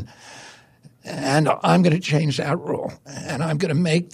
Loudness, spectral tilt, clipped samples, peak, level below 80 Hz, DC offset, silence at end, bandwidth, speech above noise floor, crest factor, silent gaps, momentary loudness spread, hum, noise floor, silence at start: -21 LUFS; -6 dB/octave; under 0.1%; -4 dBFS; -60 dBFS; under 0.1%; 0.05 s; 14 kHz; 30 dB; 18 dB; none; 23 LU; none; -51 dBFS; 0 s